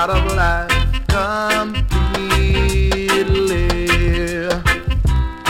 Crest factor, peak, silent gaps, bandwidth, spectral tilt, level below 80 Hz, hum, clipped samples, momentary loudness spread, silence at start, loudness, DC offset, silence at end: 12 dB; -4 dBFS; none; 16.5 kHz; -5 dB/octave; -20 dBFS; none; under 0.1%; 3 LU; 0 s; -17 LUFS; under 0.1%; 0 s